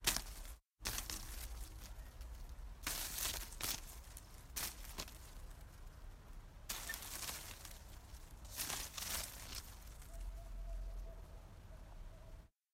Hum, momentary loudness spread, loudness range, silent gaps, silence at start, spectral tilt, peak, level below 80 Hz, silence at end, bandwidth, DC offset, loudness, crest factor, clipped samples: none; 16 LU; 5 LU; none; 0 s; -1.5 dB/octave; -18 dBFS; -52 dBFS; 0.25 s; 16 kHz; under 0.1%; -46 LUFS; 30 dB; under 0.1%